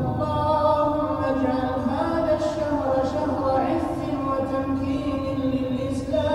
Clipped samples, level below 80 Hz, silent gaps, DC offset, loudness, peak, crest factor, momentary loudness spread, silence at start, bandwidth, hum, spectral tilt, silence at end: under 0.1%; -44 dBFS; none; under 0.1%; -24 LUFS; -8 dBFS; 14 dB; 5 LU; 0 s; 12 kHz; none; -7.5 dB/octave; 0 s